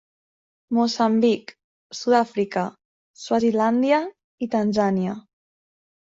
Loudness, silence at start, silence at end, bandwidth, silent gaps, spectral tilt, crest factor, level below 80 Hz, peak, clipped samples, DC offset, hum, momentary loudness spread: -22 LUFS; 0.7 s; 0.95 s; 7.8 kHz; 1.64-1.90 s, 2.85-3.14 s, 4.24-4.38 s; -6 dB/octave; 18 dB; -66 dBFS; -6 dBFS; under 0.1%; under 0.1%; none; 13 LU